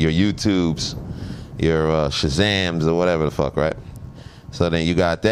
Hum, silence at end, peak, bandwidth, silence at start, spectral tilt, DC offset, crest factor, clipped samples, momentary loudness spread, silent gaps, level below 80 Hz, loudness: none; 0 s; -2 dBFS; 13 kHz; 0 s; -5.5 dB/octave; under 0.1%; 18 dB; under 0.1%; 16 LU; none; -36 dBFS; -20 LUFS